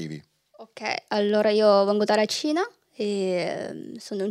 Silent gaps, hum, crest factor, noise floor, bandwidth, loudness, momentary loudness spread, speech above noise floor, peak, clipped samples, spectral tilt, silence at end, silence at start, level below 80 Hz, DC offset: none; none; 18 dB; -50 dBFS; 13.5 kHz; -24 LUFS; 16 LU; 27 dB; -6 dBFS; under 0.1%; -4.5 dB/octave; 0 s; 0 s; -76 dBFS; under 0.1%